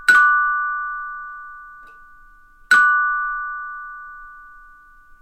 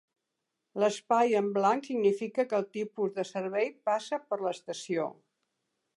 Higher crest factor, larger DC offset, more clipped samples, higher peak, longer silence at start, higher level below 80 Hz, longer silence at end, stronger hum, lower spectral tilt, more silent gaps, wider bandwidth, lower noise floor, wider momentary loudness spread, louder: about the same, 20 dB vs 18 dB; neither; neither; first, -2 dBFS vs -14 dBFS; second, 0 s vs 0.75 s; first, -54 dBFS vs -86 dBFS; second, 0.7 s vs 0.85 s; neither; second, 0.5 dB/octave vs -5 dB/octave; neither; first, 15 kHz vs 11.5 kHz; second, -47 dBFS vs -85 dBFS; first, 25 LU vs 8 LU; first, -17 LUFS vs -30 LUFS